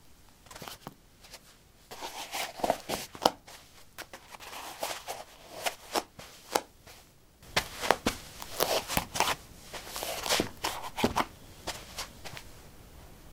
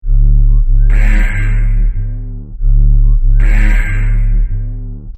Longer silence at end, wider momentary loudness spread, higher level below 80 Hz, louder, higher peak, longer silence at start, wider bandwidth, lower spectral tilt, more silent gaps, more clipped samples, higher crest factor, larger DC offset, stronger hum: about the same, 0 s vs 0 s; first, 21 LU vs 10 LU; second, -56 dBFS vs -10 dBFS; second, -33 LUFS vs -15 LUFS; about the same, -2 dBFS vs 0 dBFS; about the same, 0 s vs 0.05 s; first, 17.5 kHz vs 3.1 kHz; second, -2.5 dB/octave vs -7.5 dB/octave; neither; neither; first, 34 dB vs 8 dB; neither; neither